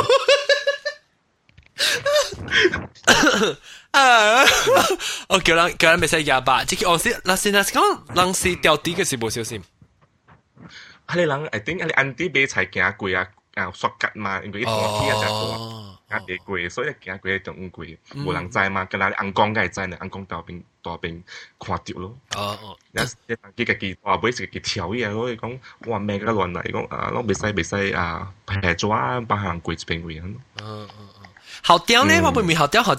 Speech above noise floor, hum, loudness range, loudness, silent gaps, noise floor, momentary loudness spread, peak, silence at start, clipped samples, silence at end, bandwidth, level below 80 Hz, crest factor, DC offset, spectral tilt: 42 dB; none; 10 LU; -20 LUFS; none; -64 dBFS; 18 LU; 0 dBFS; 0 s; under 0.1%; 0 s; 16 kHz; -48 dBFS; 22 dB; under 0.1%; -3 dB/octave